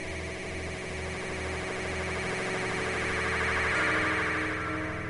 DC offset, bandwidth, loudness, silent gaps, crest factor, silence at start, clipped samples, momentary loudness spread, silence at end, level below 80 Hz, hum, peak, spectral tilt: under 0.1%; 11 kHz; -30 LUFS; none; 16 dB; 0 s; under 0.1%; 10 LU; 0 s; -46 dBFS; none; -14 dBFS; -4 dB/octave